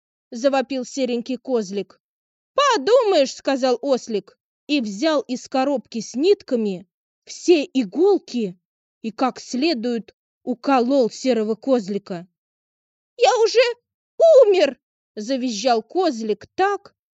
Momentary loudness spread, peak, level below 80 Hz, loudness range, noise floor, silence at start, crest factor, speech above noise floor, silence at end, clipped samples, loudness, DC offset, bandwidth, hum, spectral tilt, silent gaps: 14 LU; -4 dBFS; -74 dBFS; 4 LU; under -90 dBFS; 0.3 s; 18 dB; over 71 dB; 0.4 s; under 0.1%; -20 LUFS; under 0.1%; 8.2 kHz; none; -4 dB/octave; 2.00-2.54 s, 4.40-4.67 s, 6.92-7.22 s, 8.65-9.01 s, 10.13-10.41 s, 12.38-13.17 s, 13.94-14.18 s, 14.83-15.15 s